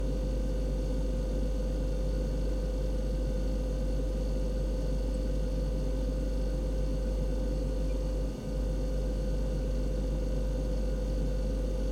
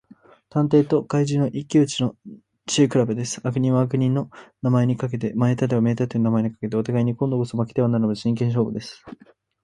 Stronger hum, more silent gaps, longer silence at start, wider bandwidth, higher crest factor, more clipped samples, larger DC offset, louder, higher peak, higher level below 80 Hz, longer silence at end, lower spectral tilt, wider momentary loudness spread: neither; neither; second, 0 s vs 0.55 s; about the same, 10 kHz vs 11 kHz; second, 10 dB vs 16 dB; neither; neither; second, -34 LUFS vs -22 LUFS; second, -20 dBFS vs -4 dBFS; first, -32 dBFS vs -58 dBFS; second, 0 s vs 0.5 s; about the same, -7.5 dB/octave vs -7 dB/octave; second, 0 LU vs 7 LU